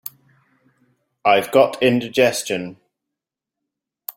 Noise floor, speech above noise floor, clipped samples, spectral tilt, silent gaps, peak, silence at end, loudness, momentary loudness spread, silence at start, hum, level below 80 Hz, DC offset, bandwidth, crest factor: -85 dBFS; 68 dB; under 0.1%; -4 dB/octave; none; -2 dBFS; 0.05 s; -18 LUFS; 20 LU; 1.25 s; none; -64 dBFS; under 0.1%; 16.5 kHz; 20 dB